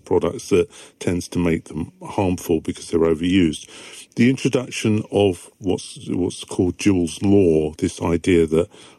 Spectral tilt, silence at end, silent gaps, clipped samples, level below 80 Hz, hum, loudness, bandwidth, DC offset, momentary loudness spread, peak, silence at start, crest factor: -6 dB/octave; 0.3 s; none; under 0.1%; -50 dBFS; none; -20 LUFS; 13 kHz; under 0.1%; 11 LU; -4 dBFS; 0.05 s; 16 dB